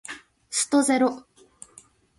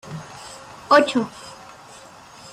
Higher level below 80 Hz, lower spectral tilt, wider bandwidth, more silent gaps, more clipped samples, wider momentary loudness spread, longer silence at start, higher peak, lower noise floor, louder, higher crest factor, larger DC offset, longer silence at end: second, -70 dBFS vs -62 dBFS; second, -2 dB/octave vs -4 dB/octave; second, 11.5 kHz vs 14 kHz; neither; neither; second, 21 LU vs 26 LU; about the same, 0.1 s vs 0.05 s; second, -10 dBFS vs -2 dBFS; first, -54 dBFS vs -44 dBFS; second, -23 LUFS vs -19 LUFS; second, 16 dB vs 22 dB; neither; about the same, 1 s vs 1 s